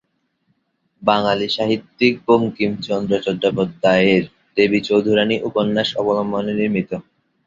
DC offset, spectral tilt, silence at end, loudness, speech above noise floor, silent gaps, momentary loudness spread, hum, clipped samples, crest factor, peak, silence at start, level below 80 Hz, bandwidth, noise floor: under 0.1%; -6.5 dB/octave; 0.45 s; -18 LUFS; 49 dB; none; 7 LU; none; under 0.1%; 16 dB; -2 dBFS; 1 s; -56 dBFS; 7.6 kHz; -67 dBFS